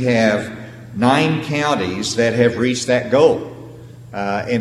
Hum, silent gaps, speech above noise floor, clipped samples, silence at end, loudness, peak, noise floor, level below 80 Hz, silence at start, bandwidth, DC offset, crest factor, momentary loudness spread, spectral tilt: none; none; 20 dB; under 0.1%; 0 s; -17 LUFS; 0 dBFS; -37 dBFS; -52 dBFS; 0 s; 13 kHz; under 0.1%; 18 dB; 17 LU; -5 dB/octave